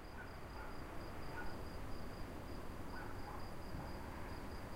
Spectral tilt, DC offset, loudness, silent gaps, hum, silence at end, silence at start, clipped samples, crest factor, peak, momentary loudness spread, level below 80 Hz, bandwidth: -6 dB/octave; under 0.1%; -50 LUFS; none; none; 0 s; 0 s; under 0.1%; 14 dB; -34 dBFS; 2 LU; -52 dBFS; 16 kHz